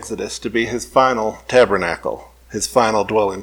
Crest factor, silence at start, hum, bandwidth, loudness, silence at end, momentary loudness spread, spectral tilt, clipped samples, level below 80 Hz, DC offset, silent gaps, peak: 18 dB; 0 s; none; 18.5 kHz; -18 LUFS; 0 s; 11 LU; -4 dB/octave; under 0.1%; -46 dBFS; under 0.1%; none; 0 dBFS